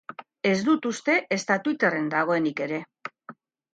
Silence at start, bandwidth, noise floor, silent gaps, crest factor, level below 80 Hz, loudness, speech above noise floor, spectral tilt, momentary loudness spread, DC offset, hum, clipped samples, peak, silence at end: 0.1 s; 9.2 kHz; -49 dBFS; none; 18 dB; -74 dBFS; -25 LUFS; 24 dB; -5 dB/octave; 17 LU; under 0.1%; none; under 0.1%; -8 dBFS; 0.4 s